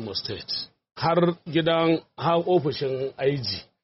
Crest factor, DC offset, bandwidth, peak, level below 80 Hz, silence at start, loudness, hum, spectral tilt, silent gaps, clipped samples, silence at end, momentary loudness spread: 16 dB; under 0.1%; 6 kHz; -10 dBFS; -60 dBFS; 0 s; -25 LUFS; none; -4.5 dB/octave; none; under 0.1%; 0.2 s; 9 LU